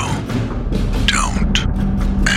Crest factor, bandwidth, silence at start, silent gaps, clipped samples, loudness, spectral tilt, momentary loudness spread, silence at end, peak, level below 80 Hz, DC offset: 16 dB; 13 kHz; 0 s; none; under 0.1%; -18 LUFS; -4.5 dB/octave; 6 LU; 0 s; 0 dBFS; -20 dBFS; under 0.1%